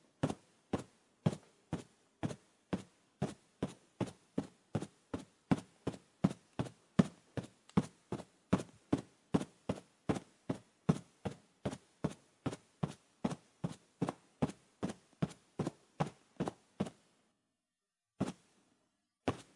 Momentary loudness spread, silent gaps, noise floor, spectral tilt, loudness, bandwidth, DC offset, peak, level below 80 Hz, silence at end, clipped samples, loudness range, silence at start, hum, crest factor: 10 LU; none; under -90 dBFS; -7 dB/octave; -42 LUFS; 11.5 kHz; under 0.1%; -14 dBFS; -68 dBFS; 0.15 s; under 0.1%; 6 LU; 0.25 s; none; 28 dB